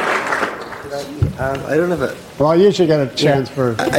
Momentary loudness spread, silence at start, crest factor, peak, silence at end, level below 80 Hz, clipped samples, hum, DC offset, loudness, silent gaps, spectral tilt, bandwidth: 13 LU; 0 s; 14 dB; -2 dBFS; 0 s; -42 dBFS; under 0.1%; none; under 0.1%; -17 LUFS; none; -6 dB/octave; 16.5 kHz